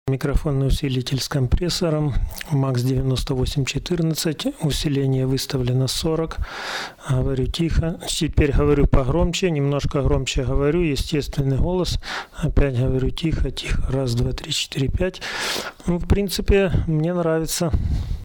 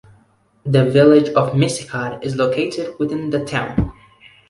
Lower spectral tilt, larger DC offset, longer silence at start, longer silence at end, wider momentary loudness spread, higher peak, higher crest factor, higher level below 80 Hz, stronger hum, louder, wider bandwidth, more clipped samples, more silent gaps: about the same, -5.5 dB/octave vs -6.5 dB/octave; neither; second, 0.05 s vs 0.65 s; second, 0 s vs 0.55 s; second, 6 LU vs 12 LU; second, -8 dBFS vs -2 dBFS; about the same, 14 dB vs 16 dB; first, -26 dBFS vs -40 dBFS; neither; second, -22 LUFS vs -17 LUFS; first, 19 kHz vs 11.5 kHz; neither; neither